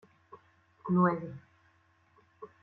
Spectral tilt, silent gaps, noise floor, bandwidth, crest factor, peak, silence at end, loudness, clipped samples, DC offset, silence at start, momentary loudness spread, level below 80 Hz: -11.5 dB/octave; none; -68 dBFS; 4.2 kHz; 22 dB; -14 dBFS; 0.15 s; -30 LUFS; under 0.1%; under 0.1%; 0.3 s; 25 LU; -74 dBFS